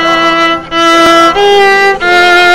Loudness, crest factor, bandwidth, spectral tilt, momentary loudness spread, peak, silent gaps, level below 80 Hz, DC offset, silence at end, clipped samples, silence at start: -6 LUFS; 6 dB; 16.5 kHz; -2.5 dB/octave; 5 LU; 0 dBFS; none; -38 dBFS; under 0.1%; 0 s; 1%; 0 s